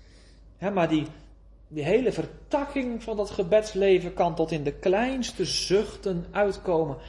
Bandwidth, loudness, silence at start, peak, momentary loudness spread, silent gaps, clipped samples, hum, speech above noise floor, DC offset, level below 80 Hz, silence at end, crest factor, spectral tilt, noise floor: 11.5 kHz; -26 LUFS; 0.45 s; -10 dBFS; 8 LU; none; under 0.1%; none; 26 dB; under 0.1%; -48 dBFS; 0 s; 16 dB; -5 dB/octave; -51 dBFS